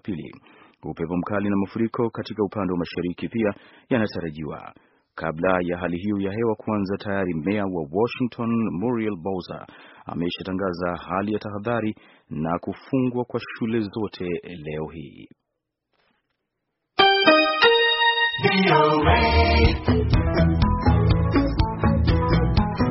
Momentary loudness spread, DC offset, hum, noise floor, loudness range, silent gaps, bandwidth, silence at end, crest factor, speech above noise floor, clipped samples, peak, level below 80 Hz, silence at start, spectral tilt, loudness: 15 LU; under 0.1%; none; -81 dBFS; 10 LU; none; 6 kHz; 0 s; 20 dB; 57 dB; under 0.1%; -2 dBFS; -32 dBFS; 0.05 s; -4.5 dB/octave; -22 LUFS